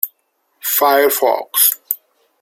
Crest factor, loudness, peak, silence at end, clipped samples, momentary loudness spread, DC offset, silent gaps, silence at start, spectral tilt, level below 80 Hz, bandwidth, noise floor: 18 dB; -15 LUFS; 0 dBFS; 0.45 s; under 0.1%; 12 LU; under 0.1%; none; 0.05 s; 0.5 dB/octave; -70 dBFS; 16.5 kHz; -65 dBFS